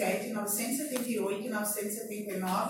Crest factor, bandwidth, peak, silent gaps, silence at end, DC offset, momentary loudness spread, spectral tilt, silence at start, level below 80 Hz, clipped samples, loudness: 18 dB; 17 kHz; -16 dBFS; none; 0 s; under 0.1%; 5 LU; -3.5 dB/octave; 0 s; -82 dBFS; under 0.1%; -33 LUFS